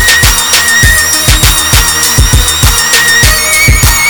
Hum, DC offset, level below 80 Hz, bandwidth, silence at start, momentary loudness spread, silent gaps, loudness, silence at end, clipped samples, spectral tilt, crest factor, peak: none; 0.9%; -14 dBFS; over 20 kHz; 0 s; 2 LU; none; -5 LUFS; 0 s; 3%; -1.5 dB/octave; 6 dB; 0 dBFS